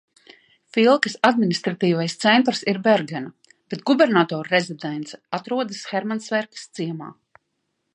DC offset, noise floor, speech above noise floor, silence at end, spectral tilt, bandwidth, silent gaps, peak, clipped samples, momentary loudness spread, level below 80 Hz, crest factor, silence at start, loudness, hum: under 0.1%; -75 dBFS; 54 dB; 0.8 s; -5 dB/octave; 10.5 kHz; none; 0 dBFS; under 0.1%; 15 LU; -72 dBFS; 22 dB; 0.75 s; -21 LUFS; none